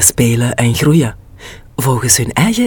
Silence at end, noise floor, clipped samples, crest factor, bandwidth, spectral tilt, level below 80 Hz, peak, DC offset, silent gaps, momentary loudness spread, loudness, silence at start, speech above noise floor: 0 s; -34 dBFS; under 0.1%; 12 dB; 19 kHz; -4 dB/octave; -36 dBFS; 0 dBFS; under 0.1%; none; 8 LU; -12 LUFS; 0 s; 22 dB